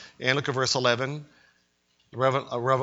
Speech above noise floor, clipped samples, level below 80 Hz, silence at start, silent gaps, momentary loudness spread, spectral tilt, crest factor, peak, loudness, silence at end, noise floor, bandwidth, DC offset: 43 dB; under 0.1%; -68 dBFS; 0 s; none; 11 LU; -4 dB/octave; 22 dB; -4 dBFS; -26 LUFS; 0 s; -69 dBFS; 8 kHz; under 0.1%